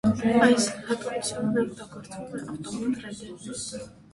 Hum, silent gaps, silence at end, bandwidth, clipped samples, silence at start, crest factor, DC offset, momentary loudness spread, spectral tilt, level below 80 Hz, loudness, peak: none; none; 0.2 s; 11.5 kHz; under 0.1%; 0.05 s; 20 dB; under 0.1%; 19 LU; -4.5 dB/octave; -58 dBFS; -27 LUFS; -6 dBFS